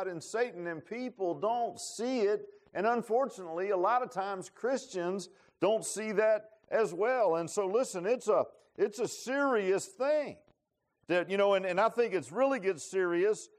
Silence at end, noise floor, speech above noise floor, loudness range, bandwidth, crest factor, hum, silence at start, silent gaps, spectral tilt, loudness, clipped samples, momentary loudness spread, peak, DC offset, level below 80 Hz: 0.1 s; -82 dBFS; 51 dB; 2 LU; 14 kHz; 16 dB; none; 0 s; none; -4 dB/octave; -32 LUFS; under 0.1%; 8 LU; -16 dBFS; under 0.1%; -84 dBFS